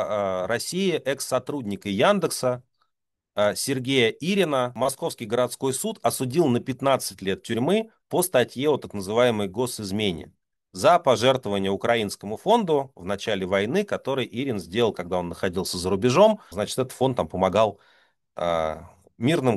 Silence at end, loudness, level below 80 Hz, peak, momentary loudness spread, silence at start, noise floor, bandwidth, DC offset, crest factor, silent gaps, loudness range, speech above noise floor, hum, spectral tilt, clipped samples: 0 s; -24 LUFS; -58 dBFS; -6 dBFS; 8 LU; 0 s; -81 dBFS; 13 kHz; under 0.1%; 18 dB; none; 2 LU; 57 dB; none; -4.5 dB/octave; under 0.1%